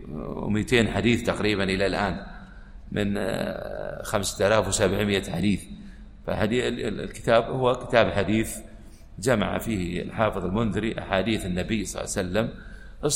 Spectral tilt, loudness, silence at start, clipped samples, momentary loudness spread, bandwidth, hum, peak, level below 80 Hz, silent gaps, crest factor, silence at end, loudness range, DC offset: -5 dB/octave; -25 LUFS; 0 s; under 0.1%; 12 LU; 16 kHz; none; -4 dBFS; -42 dBFS; none; 22 dB; 0 s; 2 LU; under 0.1%